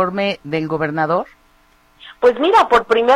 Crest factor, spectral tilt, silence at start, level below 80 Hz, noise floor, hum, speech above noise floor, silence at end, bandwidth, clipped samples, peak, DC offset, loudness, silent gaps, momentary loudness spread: 16 dB; -6 dB/octave; 0 s; -52 dBFS; -54 dBFS; none; 38 dB; 0 s; 11 kHz; under 0.1%; -2 dBFS; under 0.1%; -16 LUFS; none; 9 LU